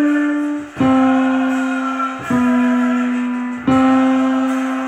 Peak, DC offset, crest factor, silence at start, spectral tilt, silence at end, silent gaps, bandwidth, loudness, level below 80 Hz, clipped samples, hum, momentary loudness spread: -4 dBFS; under 0.1%; 12 dB; 0 s; -6 dB/octave; 0 s; none; 8.8 kHz; -16 LUFS; -52 dBFS; under 0.1%; none; 7 LU